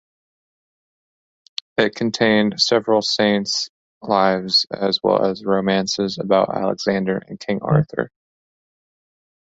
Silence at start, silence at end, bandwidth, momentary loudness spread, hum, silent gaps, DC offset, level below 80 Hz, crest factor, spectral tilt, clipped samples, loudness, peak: 1.8 s; 1.5 s; 8 kHz; 10 LU; none; 3.69-4.01 s; under 0.1%; -58 dBFS; 18 dB; -4.5 dB/octave; under 0.1%; -19 LUFS; -2 dBFS